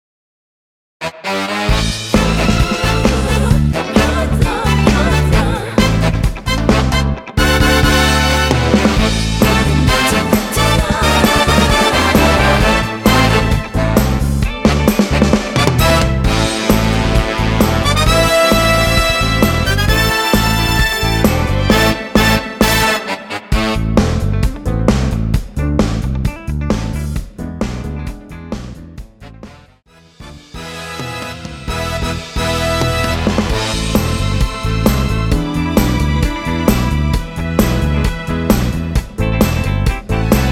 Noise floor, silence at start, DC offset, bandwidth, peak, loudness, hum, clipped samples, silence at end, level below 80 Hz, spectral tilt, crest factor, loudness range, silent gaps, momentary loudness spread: -46 dBFS; 1 s; under 0.1%; 18 kHz; 0 dBFS; -14 LUFS; none; under 0.1%; 0 s; -20 dBFS; -5 dB/octave; 14 dB; 10 LU; none; 10 LU